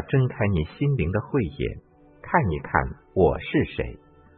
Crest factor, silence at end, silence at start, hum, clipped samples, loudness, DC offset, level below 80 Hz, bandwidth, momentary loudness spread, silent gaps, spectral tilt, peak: 22 dB; 0.4 s; 0 s; none; under 0.1%; -25 LUFS; under 0.1%; -40 dBFS; 4.3 kHz; 9 LU; none; -12 dB/octave; -4 dBFS